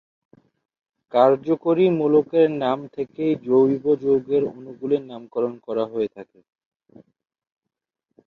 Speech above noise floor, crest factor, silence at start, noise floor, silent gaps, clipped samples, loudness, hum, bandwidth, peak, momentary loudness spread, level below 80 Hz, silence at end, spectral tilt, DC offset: 64 dB; 20 dB; 1.15 s; -85 dBFS; none; under 0.1%; -21 LUFS; none; 4.7 kHz; -2 dBFS; 10 LU; -66 dBFS; 2.05 s; -9 dB/octave; under 0.1%